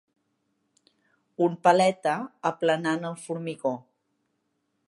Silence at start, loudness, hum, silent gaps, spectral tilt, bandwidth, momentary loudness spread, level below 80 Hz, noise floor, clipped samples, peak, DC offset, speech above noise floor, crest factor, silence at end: 1.4 s; -26 LUFS; none; none; -5.5 dB/octave; 11.5 kHz; 13 LU; -80 dBFS; -76 dBFS; under 0.1%; -6 dBFS; under 0.1%; 51 dB; 22 dB; 1.1 s